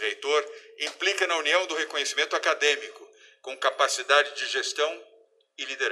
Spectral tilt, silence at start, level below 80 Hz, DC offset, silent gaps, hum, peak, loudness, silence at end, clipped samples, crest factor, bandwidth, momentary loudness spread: 2.5 dB/octave; 0 s; -90 dBFS; under 0.1%; none; none; -6 dBFS; -25 LUFS; 0 s; under 0.1%; 20 dB; 13.5 kHz; 15 LU